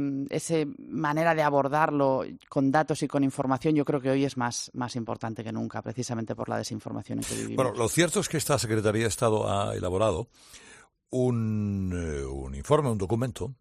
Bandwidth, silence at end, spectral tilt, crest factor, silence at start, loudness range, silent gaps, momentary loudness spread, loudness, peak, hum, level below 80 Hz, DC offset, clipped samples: 14 kHz; 0.05 s; -5.5 dB/octave; 20 dB; 0 s; 5 LU; none; 10 LU; -28 LUFS; -8 dBFS; none; -52 dBFS; under 0.1%; under 0.1%